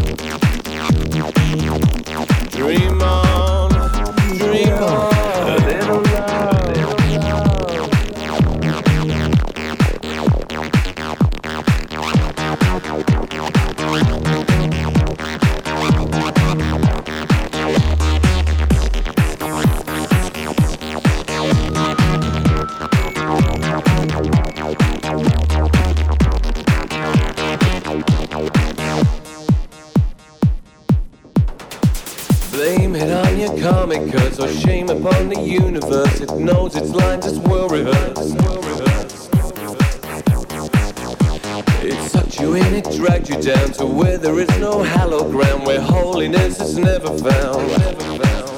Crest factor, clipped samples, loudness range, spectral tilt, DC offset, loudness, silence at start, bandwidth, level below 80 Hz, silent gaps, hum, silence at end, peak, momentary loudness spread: 16 dB; under 0.1%; 3 LU; -6.5 dB/octave; under 0.1%; -17 LUFS; 0 s; 20 kHz; -22 dBFS; none; none; 0 s; 0 dBFS; 4 LU